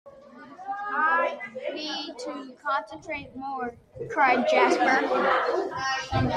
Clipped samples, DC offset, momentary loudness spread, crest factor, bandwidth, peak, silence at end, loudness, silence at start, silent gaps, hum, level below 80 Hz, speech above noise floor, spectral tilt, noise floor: under 0.1%; under 0.1%; 15 LU; 18 dB; 11 kHz; -8 dBFS; 0 s; -26 LUFS; 0.05 s; none; none; -54 dBFS; 22 dB; -5 dB/octave; -47 dBFS